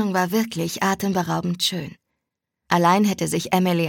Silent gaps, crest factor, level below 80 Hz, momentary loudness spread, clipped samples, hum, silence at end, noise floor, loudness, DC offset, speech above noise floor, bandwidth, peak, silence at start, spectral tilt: none; 20 dB; -62 dBFS; 7 LU; under 0.1%; none; 0 s; -81 dBFS; -21 LUFS; under 0.1%; 61 dB; 17.5 kHz; -2 dBFS; 0 s; -5 dB/octave